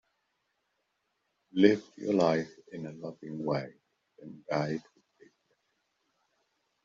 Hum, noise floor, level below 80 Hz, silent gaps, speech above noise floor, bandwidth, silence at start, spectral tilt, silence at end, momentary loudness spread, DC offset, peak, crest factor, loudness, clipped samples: none; -80 dBFS; -74 dBFS; none; 50 dB; 7.4 kHz; 1.55 s; -5.5 dB/octave; 2.05 s; 18 LU; under 0.1%; -8 dBFS; 26 dB; -30 LUFS; under 0.1%